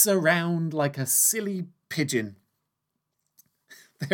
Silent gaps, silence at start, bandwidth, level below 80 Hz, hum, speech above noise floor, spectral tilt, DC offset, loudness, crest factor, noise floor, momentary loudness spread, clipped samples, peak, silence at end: none; 0 s; 19 kHz; -80 dBFS; none; 56 dB; -3.5 dB/octave; under 0.1%; -24 LUFS; 22 dB; -81 dBFS; 15 LU; under 0.1%; -6 dBFS; 0 s